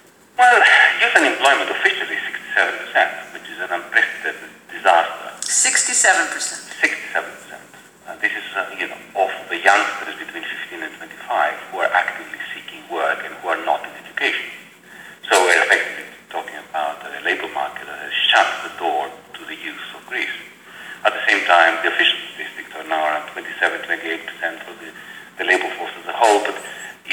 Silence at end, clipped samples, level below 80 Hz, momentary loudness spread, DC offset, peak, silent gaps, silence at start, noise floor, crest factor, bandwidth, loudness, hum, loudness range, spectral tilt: 0 s; under 0.1%; -74 dBFS; 19 LU; under 0.1%; 0 dBFS; none; 0.4 s; -44 dBFS; 20 dB; over 20 kHz; -18 LUFS; none; 6 LU; 0.5 dB/octave